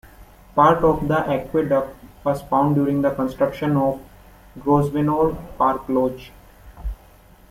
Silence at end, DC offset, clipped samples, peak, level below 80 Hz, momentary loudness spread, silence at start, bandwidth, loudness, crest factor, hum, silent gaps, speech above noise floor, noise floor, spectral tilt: 0.55 s; under 0.1%; under 0.1%; -2 dBFS; -40 dBFS; 16 LU; 0.2 s; 16 kHz; -20 LUFS; 18 dB; none; none; 29 dB; -49 dBFS; -8.5 dB/octave